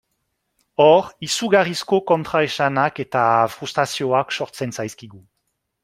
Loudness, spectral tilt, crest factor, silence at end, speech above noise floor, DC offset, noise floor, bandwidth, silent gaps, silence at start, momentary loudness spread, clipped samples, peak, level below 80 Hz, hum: -19 LUFS; -4.5 dB/octave; 18 dB; 0.65 s; 55 dB; under 0.1%; -74 dBFS; 16 kHz; none; 0.8 s; 12 LU; under 0.1%; -2 dBFS; -62 dBFS; none